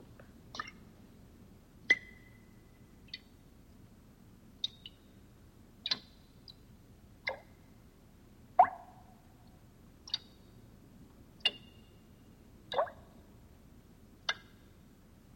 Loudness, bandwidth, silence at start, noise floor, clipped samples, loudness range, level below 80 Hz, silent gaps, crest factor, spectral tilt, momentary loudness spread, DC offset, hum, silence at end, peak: -36 LUFS; 16.5 kHz; 0.2 s; -59 dBFS; under 0.1%; 7 LU; -64 dBFS; none; 30 dB; -2.5 dB/octave; 29 LU; under 0.1%; none; 1 s; -12 dBFS